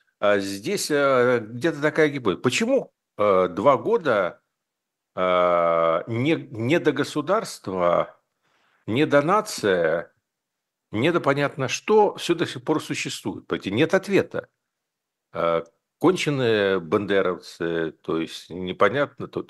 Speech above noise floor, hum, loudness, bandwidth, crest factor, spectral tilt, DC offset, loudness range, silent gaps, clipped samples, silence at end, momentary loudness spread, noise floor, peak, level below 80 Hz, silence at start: 61 dB; none; -23 LUFS; 12.5 kHz; 20 dB; -5 dB/octave; under 0.1%; 3 LU; none; under 0.1%; 0.05 s; 10 LU; -83 dBFS; -4 dBFS; -66 dBFS; 0.2 s